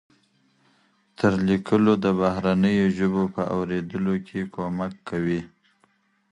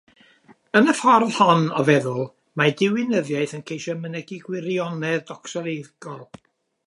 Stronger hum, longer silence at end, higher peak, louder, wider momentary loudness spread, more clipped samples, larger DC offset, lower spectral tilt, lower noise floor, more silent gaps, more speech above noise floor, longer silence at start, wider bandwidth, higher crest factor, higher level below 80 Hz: neither; first, 0.85 s vs 0.65 s; second, -6 dBFS vs -2 dBFS; second, -24 LUFS vs -21 LUFS; second, 10 LU vs 16 LU; neither; neither; first, -8 dB/octave vs -5.5 dB/octave; first, -65 dBFS vs -54 dBFS; neither; first, 42 dB vs 33 dB; first, 1.2 s vs 0.75 s; second, 9.8 kHz vs 11.5 kHz; about the same, 18 dB vs 20 dB; first, -52 dBFS vs -72 dBFS